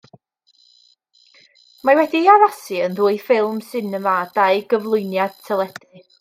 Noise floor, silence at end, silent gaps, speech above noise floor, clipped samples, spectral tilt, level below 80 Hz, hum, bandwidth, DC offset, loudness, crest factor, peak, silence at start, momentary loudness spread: -59 dBFS; 0.5 s; none; 41 dB; under 0.1%; -5.5 dB/octave; -74 dBFS; none; 16 kHz; under 0.1%; -18 LUFS; 18 dB; -2 dBFS; 1.85 s; 10 LU